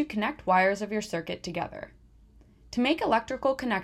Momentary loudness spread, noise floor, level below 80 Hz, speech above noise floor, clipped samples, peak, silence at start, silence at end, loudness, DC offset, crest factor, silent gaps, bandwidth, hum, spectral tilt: 12 LU; -56 dBFS; -56 dBFS; 28 dB; under 0.1%; -12 dBFS; 0 s; 0 s; -28 LUFS; under 0.1%; 18 dB; none; 14 kHz; none; -5 dB/octave